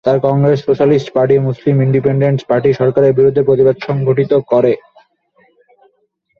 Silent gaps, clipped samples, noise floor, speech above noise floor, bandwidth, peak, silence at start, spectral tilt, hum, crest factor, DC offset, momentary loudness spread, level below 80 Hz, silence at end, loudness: none; under 0.1%; -62 dBFS; 50 dB; 6.8 kHz; -2 dBFS; 0.05 s; -9.5 dB/octave; none; 12 dB; under 0.1%; 3 LU; -50 dBFS; 1.65 s; -13 LUFS